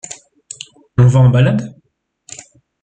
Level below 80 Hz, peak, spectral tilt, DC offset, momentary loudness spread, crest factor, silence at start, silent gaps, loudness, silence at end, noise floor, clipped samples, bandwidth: -44 dBFS; -2 dBFS; -7 dB/octave; under 0.1%; 24 LU; 14 dB; 0.1 s; none; -12 LUFS; 1.15 s; -49 dBFS; under 0.1%; 9 kHz